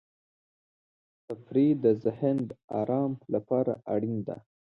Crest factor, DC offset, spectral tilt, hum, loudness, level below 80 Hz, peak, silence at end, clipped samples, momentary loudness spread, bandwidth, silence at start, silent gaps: 18 dB; under 0.1%; -11 dB/octave; none; -29 LUFS; -70 dBFS; -12 dBFS; 0.3 s; under 0.1%; 14 LU; 4.5 kHz; 1.3 s; 2.64-2.68 s